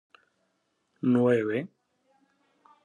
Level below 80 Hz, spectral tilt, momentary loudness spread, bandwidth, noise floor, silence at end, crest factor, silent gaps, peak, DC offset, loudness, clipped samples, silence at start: -80 dBFS; -8.5 dB/octave; 12 LU; 9.2 kHz; -75 dBFS; 1.2 s; 18 dB; none; -12 dBFS; under 0.1%; -26 LUFS; under 0.1%; 1.05 s